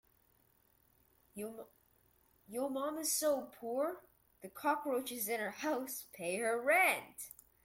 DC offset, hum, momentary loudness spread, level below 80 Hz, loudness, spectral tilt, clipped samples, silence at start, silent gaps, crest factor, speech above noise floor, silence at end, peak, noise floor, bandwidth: under 0.1%; none; 19 LU; -80 dBFS; -36 LUFS; -2 dB/octave; under 0.1%; 1.35 s; none; 20 dB; 35 dB; 0.35 s; -18 dBFS; -72 dBFS; 16.5 kHz